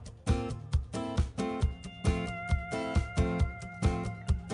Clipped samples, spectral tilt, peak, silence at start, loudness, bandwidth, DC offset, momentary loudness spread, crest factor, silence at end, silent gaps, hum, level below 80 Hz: under 0.1%; -6.5 dB/octave; -16 dBFS; 0 s; -33 LUFS; 10.5 kHz; under 0.1%; 4 LU; 16 dB; 0 s; none; none; -36 dBFS